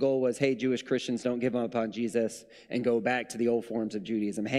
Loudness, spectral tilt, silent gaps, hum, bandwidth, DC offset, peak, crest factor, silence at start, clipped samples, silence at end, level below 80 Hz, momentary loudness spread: -30 LUFS; -5.5 dB/octave; none; none; 13 kHz; under 0.1%; -14 dBFS; 16 dB; 0 s; under 0.1%; 0 s; -70 dBFS; 6 LU